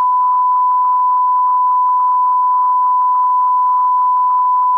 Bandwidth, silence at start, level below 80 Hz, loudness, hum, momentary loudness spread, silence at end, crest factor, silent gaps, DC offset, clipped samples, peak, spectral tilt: 1.9 kHz; 0 s; -82 dBFS; -13 LUFS; none; 0 LU; 0 s; 4 dB; none; under 0.1%; under 0.1%; -8 dBFS; -1.5 dB/octave